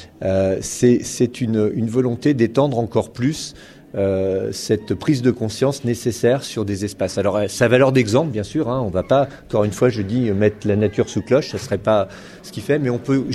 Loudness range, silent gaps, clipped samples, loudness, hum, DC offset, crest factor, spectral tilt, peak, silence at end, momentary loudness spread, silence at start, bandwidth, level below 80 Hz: 2 LU; none; under 0.1%; -19 LUFS; none; under 0.1%; 18 dB; -6 dB/octave; -2 dBFS; 0 s; 6 LU; 0 s; 13.5 kHz; -48 dBFS